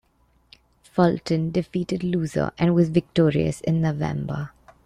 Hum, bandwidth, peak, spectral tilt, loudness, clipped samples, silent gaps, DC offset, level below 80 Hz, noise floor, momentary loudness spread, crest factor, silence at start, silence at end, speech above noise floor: none; 10.5 kHz; -6 dBFS; -7.5 dB/octave; -23 LUFS; under 0.1%; none; under 0.1%; -50 dBFS; -63 dBFS; 9 LU; 18 dB; 0.95 s; 0.35 s; 41 dB